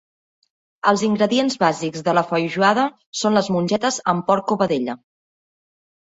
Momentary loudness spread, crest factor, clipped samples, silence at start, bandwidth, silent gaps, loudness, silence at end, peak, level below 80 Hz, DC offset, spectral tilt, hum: 6 LU; 18 dB; under 0.1%; 0.85 s; 8 kHz; 3.06-3.13 s; -20 LUFS; 1.15 s; -2 dBFS; -62 dBFS; under 0.1%; -4.5 dB/octave; none